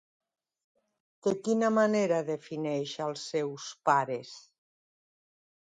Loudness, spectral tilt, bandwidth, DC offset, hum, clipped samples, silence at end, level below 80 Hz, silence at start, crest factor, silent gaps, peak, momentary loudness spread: -30 LUFS; -5 dB/octave; 9.4 kHz; under 0.1%; none; under 0.1%; 1.4 s; -80 dBFS; 1.25 s; 22 dB; none; -10 dBFS; 11 LU